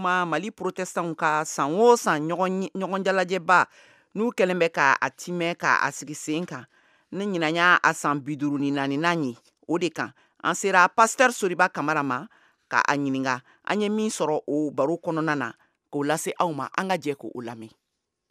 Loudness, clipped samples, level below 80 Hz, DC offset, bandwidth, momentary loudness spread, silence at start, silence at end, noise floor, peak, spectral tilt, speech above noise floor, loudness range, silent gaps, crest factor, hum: -24 LUFS; under 0.1%; -80 dBFS; under 0.1%; 15.5 kHz; 13 LU; 0 s; 0.6 s; -80 dBFS; -2 dBFS; -4 dB/octave; 56 dB; 4 LU; none; 22 dB; none